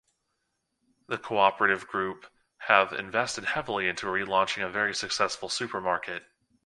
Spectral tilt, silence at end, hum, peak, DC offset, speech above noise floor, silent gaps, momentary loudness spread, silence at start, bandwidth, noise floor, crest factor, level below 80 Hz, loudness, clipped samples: -2.5 dB/octave; 0.45 s; none; -2 dBFS; under 0.1%; 51 dB; none; 13 LU; 1.1 s; 11.5 kHz; -79 dBFS; 26 dB; -66 dBFS; -27 LUFS; under 0.1%